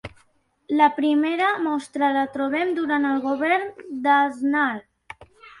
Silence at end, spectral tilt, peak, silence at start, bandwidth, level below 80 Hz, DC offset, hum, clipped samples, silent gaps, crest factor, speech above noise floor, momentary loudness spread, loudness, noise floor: 0.1 s; -5 dB/octave; -4 dBFS; 0.05 s; 11 kHz; -62 dBFS; under 0.1%; none; under 0.1%; none; 18 dB; 42 dB; 7 LU; -22 LUFS; -63 dBFS